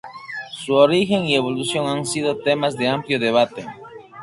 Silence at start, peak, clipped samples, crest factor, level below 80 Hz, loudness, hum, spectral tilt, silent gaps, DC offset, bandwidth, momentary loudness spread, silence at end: 0.05 s; -2 dBFS; under 0.1%; 18 dB; -60 dBFS; -19 LUFS; none; -4.5 dB/octave; none; under 0.1%; 11.5 kHz; 17 LU; 0 s